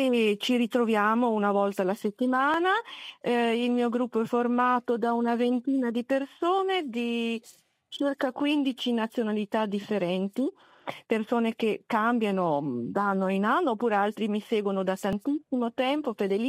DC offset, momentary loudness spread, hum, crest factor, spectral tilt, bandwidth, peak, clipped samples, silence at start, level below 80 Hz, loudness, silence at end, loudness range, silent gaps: under 0.1%; 6 LU; none; 16 dB; -6 dB/octave; 15 kHz; -12 dBFS; under 0.1%; 0 s; -72 dBFS; -27 LUFS; 0 s; 3 LU; none